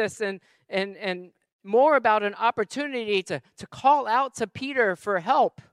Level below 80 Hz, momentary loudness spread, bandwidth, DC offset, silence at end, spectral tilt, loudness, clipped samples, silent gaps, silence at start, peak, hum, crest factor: -70 dBFS; 12 LU; 13 kHz; under 0.1%; 0.25 s; -4.5 dB/octave; -24 LUFS; under 0.1%; 1.52-1.59 s; 0 s; -6 dBFS; none; 18 dB